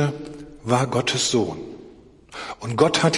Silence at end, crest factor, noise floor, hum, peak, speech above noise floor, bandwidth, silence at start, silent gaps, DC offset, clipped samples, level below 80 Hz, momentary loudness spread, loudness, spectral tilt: 0 s; 18 dB; -47 dBFS; none; -4 dBFS; 26 dB; 11.5 kHz; 0 s; none; under 0.1%; under 0.1%; -54 dBFS; 19 LU; -22 LUFS; -4 dB/octave